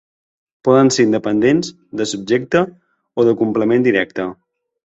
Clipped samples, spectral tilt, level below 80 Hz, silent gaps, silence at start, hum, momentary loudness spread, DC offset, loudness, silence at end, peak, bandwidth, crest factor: under 0.1%; -5.5 dB/octave; -56 dBFS; none; 0.65 s; none; 12 LU; under 0.1%; -16 LUFS; 0.55 s; -2 dBFS; 8.2 kHz; 16 dB